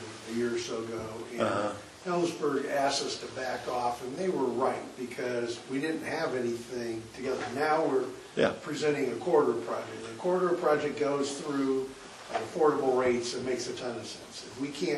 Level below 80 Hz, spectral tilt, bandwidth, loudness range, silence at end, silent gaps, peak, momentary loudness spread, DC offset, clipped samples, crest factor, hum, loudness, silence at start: -66 dBFS; -4.5 dB/octave; 12.5 kHz; 3 LU; 0 s; none; -12 dBFS; 10 LU; under 0.1%; under 0.1%; 20 dB; none; -31 LUFS; 0 s